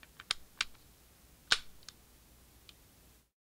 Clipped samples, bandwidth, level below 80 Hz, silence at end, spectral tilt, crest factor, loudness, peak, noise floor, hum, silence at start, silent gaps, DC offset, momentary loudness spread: under 0.1%; 17.5 kHz; -64 dBFS; 1.6 s; 0.5 dB/octave; 34 dB; -36 LUFS; -10 dBFS; -63 dBFS; none; 0.2 s; none; under 0.1%; 25 LU